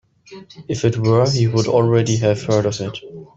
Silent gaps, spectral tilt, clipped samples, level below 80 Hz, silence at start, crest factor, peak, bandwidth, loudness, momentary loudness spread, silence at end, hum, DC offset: none; -6 dB/octave; under 0.1%; -52 dBFS; 0.3 s; 16 dB; -2 dBFS; 7.8 kHz; -17 LUFS; 12 LU; 0.15 s; none; under 0.1%